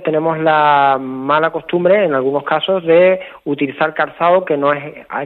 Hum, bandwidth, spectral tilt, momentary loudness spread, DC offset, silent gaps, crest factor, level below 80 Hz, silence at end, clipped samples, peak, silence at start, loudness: none; 4.3 kHz; -8 dB/octave; 9 LU; under 0.1%; none; 14 dB; -60 dBFS; 0 s; under 0.1%; 0 dBFS; 0 s; -14 LUFS